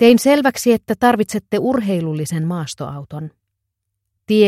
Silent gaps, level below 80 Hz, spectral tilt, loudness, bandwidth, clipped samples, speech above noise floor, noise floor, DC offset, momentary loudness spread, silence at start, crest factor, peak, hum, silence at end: none; -54 dBFS; -5.5 dB/octave; -17 LUFS; 15.5 kHz; under 0.1%; 60 dB; -76 dBFS; under 0.1%; 15 LU; 0 s; 16 dB; 0 dBFS; none; 0 s